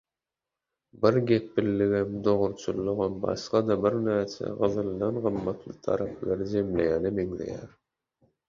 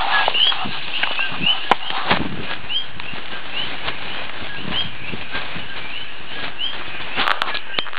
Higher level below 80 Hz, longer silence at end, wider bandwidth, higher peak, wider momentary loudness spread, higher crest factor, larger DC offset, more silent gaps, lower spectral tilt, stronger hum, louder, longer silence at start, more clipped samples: second, -54 dBFS vs -48 dBFS; first, 0.8 s vs 0 s; first, 7.4 kHz vs 4 kHz; second, -8 dBFS vs 0 dBFS; second, 8 LU vs 12 LU; about the same, 20 dB vs 22 dB; second, under 0.1% vs 10%; neither; about the same, -7.5 dB/octave vs -7 dB/octave; neither; second, -28 LUFS vs -21 LUFS; first, 0.95 s vs 0 s; neither